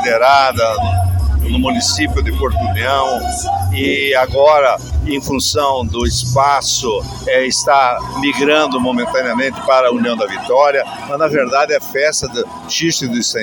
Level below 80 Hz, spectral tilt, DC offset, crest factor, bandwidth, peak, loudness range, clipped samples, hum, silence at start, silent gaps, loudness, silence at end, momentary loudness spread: -26 dBFS; -4 dB/octave; under 0.1%; 14 dB; 17.5 kHz; 0 dBFS; 2 LU; under 0.1%; none; 0 s; none; -14 LUFS; 0 s; 7 LU